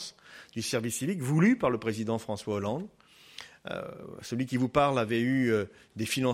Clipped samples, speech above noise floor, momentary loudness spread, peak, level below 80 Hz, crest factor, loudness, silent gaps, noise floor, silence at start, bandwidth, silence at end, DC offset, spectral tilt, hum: under 0.1%; 21 dB; 18 LU; -10 dBFS; -62 dBFS; 20 dB; -29 LUFS; none; -50 dBFS; 0 s; 15.5 kHz; 0 s; under 0.1%; -5.5 dB/octave; none